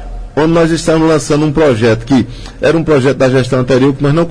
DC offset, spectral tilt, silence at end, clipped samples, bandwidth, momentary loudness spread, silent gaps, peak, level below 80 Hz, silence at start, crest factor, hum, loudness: under 0.1%; -6.5 dB/octave; 0 s; under 0.1%; 10.5 kHz; 4 LU; none; 0 dBFS; -30 dBFS; 0 s; 10 dB; none; -11 LUFS